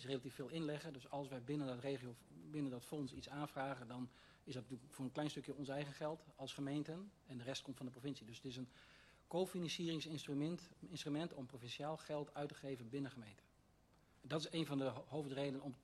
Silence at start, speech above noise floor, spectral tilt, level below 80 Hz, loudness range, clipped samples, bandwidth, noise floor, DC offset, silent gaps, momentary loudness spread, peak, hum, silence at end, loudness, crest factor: 0 s; 26 dB; -5.5 dB/octave; -76 dBFS; 3 LU; under 0.1%; 13 kHz; -73 dBFS; under 0.1%; none; 10 LU; -28 dBFS; none; 0 s; -47 LUFS; 18 dB